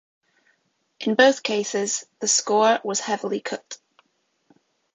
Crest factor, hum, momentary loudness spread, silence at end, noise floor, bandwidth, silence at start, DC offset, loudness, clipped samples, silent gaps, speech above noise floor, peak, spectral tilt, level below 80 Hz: 24 dB; none; 15 LU; 1.2 s; -70 dBFS; 9.4 kHz; 1 s; under 0.1%; -22 LUFS; under 0.1%; none; 48 dB; -2 dBFS; -2 dB/octave; -72 dBFS